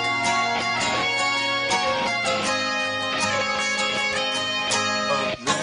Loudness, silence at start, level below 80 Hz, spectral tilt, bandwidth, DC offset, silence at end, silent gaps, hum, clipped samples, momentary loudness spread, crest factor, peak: -22 LUFS; 0 s; -58 dBFS; -1.5 dB/octave; 11 kHz; under 0.1%; 0 s; none; none; under 0.1%; 2 LU; 16 dB; -8 dBFS